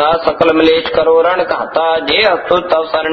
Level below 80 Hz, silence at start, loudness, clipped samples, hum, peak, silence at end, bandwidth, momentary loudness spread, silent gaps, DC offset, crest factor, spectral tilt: -44 dBFS; 0 s; -12 LUFS; under 0.1%; none; 0 dBFS; 0 s; 6.2 kHz; 4 LU; none; under 0.1%; 12 dB; -6 dB/octave